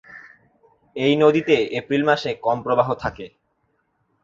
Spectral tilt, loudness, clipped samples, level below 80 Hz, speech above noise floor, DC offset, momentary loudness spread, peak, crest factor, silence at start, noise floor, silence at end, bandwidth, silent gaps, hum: -6.5 dB/octave; -20 LUFS; under 0.1%; -54 dBFS; 49 dB; under 0.1%; 16 LU; -2 dBFS; 20 dB; 0.1 s; -69 dBFS; 0.95 s; 7.6 kHz; none; none